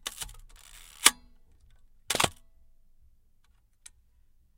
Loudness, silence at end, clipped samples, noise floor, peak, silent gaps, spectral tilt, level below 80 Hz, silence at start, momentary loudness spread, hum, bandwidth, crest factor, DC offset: -26 LUFS; 2.25 s; under 0.1%; -63 dBFS; 0 dBFS; none; 0 dB/octave; -56 dBFS; 0.05 s; 24 LU; none; 17 kHz; 34 dB; under 0.1%